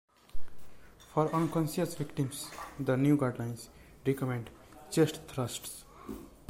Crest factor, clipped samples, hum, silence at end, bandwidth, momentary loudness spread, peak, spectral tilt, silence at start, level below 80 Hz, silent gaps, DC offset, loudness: 18 dB; under 0.1%; none; 0.2 s; 16.5 kHz; 17 LU; -14 dBFS; -6 dB/octave; 0.35 s; -56 dBFS; none; under 0.1%; -33 LUFS